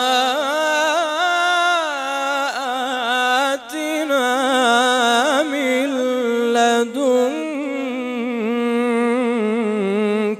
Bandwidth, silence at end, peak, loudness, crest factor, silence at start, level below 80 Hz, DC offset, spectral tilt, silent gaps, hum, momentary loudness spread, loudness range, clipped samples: 15.5 kHz; 0 s; -4 dBFS; -18 LUFS; 14 dB; 0 s; -72 dBFS; under 0.1%; -3 dB/octave; none; none; 7 LU; 2 LU; under 0.1%